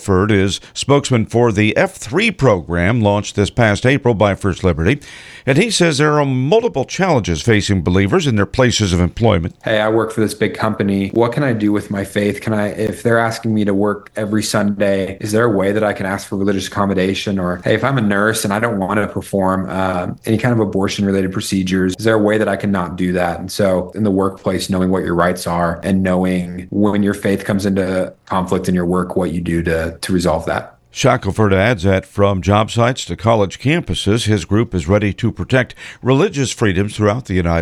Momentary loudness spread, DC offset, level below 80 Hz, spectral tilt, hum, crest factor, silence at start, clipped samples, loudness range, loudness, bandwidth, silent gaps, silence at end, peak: 5 LU; under 0.1%; -38 dBFS; -5.5 dB/octave; none; 16 dB; 0 s; under 0.1%; 3 LU; -16 LUFS; 13 kHz; none; 0 s; 0 dBFS